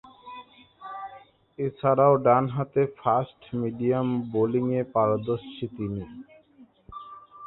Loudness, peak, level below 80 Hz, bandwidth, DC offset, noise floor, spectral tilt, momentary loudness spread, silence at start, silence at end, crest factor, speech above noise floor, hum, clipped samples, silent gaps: -25 LUFS; -6 dBFS; -60 dBFS; 4.1 kHz; under 0.1%; -56 dBFS; -12 dB/octave; 23 LU; 0.05 s; 0 s; 20 dB; 31 dB; none; under 0.1%; none